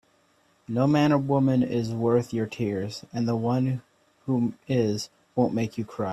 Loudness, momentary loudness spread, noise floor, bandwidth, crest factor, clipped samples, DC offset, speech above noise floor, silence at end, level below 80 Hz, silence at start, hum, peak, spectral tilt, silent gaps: -26 LUFS; 10 LU; -64 dBFS; 13 kHz; 16 dB; under 0.1%; under 0.1%; 40 dB; 0 s; -62 dBFS; 0.7 s; none; -8 dBFS; -7.5 dB/octave; none